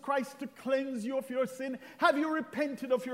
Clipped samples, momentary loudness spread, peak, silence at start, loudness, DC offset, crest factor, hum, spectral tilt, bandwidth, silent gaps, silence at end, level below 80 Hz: under 0.1%; 11 LU; -12 dBFS; 0.05 s; -33 LUFS; under 0.1%; 20 dB; none; -4.5 dB/octave; 16 kHz; none; 0 s; -84 dBFS